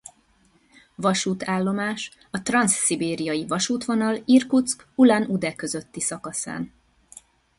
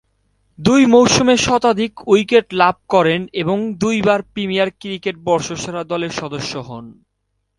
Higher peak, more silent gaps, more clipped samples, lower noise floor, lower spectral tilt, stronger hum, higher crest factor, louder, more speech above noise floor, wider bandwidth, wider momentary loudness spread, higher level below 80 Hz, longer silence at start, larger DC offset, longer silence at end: second, -6 dBFS vs 0 dBFS; neither; neither; second, -61 dBFS vs -71 dBFS; about the same, -4 dB/octave vs -4.5 dB/octave; neither; about the same, 18 dB vs 16 dB; second, -23 LUFS vs -16 LUFS; second, 38 dB vs 55 dB; about the same, 11.5 kHz vs 11.5 kHz; about the same, 12 LU vs 13 LU; second, -62 dBFS vs -48 dBFS; first, 1 s vs 0.6 s; neither; first, 0.9 s vs 0.65 s